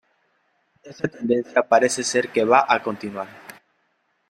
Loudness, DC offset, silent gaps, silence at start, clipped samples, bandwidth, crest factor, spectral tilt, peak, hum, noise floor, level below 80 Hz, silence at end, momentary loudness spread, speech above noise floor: -21 LUFS; under 0.1%; none; 0.85 s; under 0.1%; 16 kHz; 22 dB; -3.5 dB/octave; -2 dBFS; none; -69 dBFS; -68 dBFS; 0.8 s; 15 LU; 48 dB